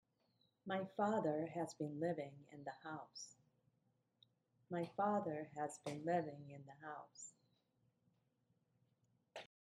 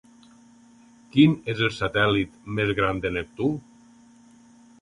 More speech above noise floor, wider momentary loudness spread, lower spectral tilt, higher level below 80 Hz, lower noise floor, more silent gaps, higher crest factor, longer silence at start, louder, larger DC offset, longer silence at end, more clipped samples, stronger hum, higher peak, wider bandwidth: first, 39 dB vs 30 dB; first, 17 LU vs 9 LU; about the same, -6 dB/octave vs -7 dB/octave; second, under -90 dBFS vs -50 dBFS; first, -83 dBFS vs -53 dBFS; neither; about the same, 20 dB vs 20 dB; second, 0.65 s vs 1.15 s; second, -44 LUFS vs -24 LUFS; neither; second, 0.2 s vs 1.25 s; neither; neither; second, -26 dBFS vs -6 dBFS; first, 13 kHz vs 11 kHz